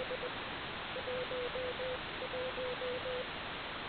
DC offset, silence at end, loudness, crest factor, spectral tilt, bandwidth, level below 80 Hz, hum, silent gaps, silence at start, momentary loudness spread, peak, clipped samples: under 0.1%; 0 s; -39 LUFS; 12 dB; -1.5 dB/octave; 4.8 kHz; -60 dBFS; none; none; 0 s; 3 LU; -28 dBFS; under 0.1%